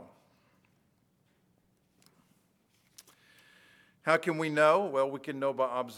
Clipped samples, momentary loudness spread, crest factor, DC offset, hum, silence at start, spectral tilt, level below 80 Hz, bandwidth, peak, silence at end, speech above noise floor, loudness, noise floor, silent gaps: under 0.1%; 9 LU; 24 dB; under 0.1%; none; 0 s; -5.5 dB/octave; -86 dBFS; 15 kHz; -10 dBFS; 0 s; 43 dB; -29 LUFS; -71 dBFS; none